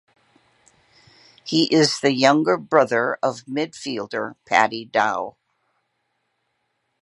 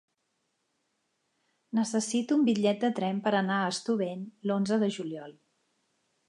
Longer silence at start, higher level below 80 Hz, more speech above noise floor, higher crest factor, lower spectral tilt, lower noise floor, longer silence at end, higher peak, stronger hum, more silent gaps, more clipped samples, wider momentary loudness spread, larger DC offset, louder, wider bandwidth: second, 1.45 s vs 1.75 s; first, -72 dBFS vs -80 dBFS; about the same, 53 dB vs 50 dB; about the same, 22 dB vs 18 dB; about the same, -4 dB/octave vs -5 dB/octave; second, -73 dBFS vs -78 dBFS; first, 1.7 s vs 1 s; first, 0 dBFS vs -14 dBFS; neither; neither; neither; first, 12 LU vs 9 LU; neither; first, -20 LUFS vs -29 LUFS; about the same, 11.5 kHz vs 11 kHz